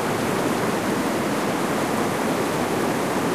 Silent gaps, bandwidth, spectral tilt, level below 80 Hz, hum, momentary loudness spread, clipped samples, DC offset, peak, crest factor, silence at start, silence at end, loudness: none; 15.5 kHz; -4.5 dB/octave; -52 dBFS; none; 1 LU; under 0.1%; 0.2%; -10 dBFS; 12 dB; 0 s; 0 s; -23 LUFS